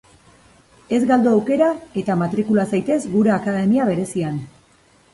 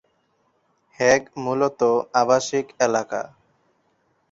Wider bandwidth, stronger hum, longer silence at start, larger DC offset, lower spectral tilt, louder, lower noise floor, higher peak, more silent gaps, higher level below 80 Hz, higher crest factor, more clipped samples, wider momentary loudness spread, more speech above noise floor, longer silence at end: first, 11.5 kHz vs 8 kHz; neither; about the same, 0.9 s vs 1 s; neither; first, -7.5 dB/octave vs -4 dB/octave; about the same, -19 LUFS vs -21 LUFS; second, -54 dBFS vs -67 dBFS; about the same, -4 dBFS vs -4 dBFS; neither; first, -56 dBFS vs -62 dBFS; second, 14 dB vs 20 dB; neither; about the same, 8 LU vs 10 LU; second, 36 dB vs 46 dB; second, 0.7 s vs 1.05 s